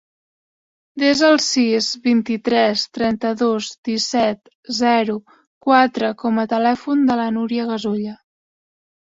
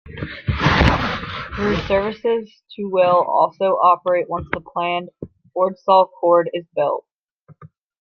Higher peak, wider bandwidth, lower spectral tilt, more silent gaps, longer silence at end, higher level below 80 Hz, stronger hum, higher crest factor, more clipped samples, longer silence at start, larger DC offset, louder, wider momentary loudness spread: about the same, -2 dBFS vs -2 dBFS; first, 7.8 kHz vs 7 kHz; second, -3.5 dB/octave vs -7 dB/octave; first, 3.78-3.83 s, 4.55-4.63 s, 5.47-5.61 s vs 7.15-7.22 s, 7.31-7.45 s; first, 0.95 s vs 0.35 s; second, -60 dBFS vs -34 dBFS; neither; about the same, 18 dB vs 18 dB; neither; first, 0.95 s vs 0.05 s; neither; about the same, -18 LUFS vs -19 LUFS; second, 9 LU vs 13 LU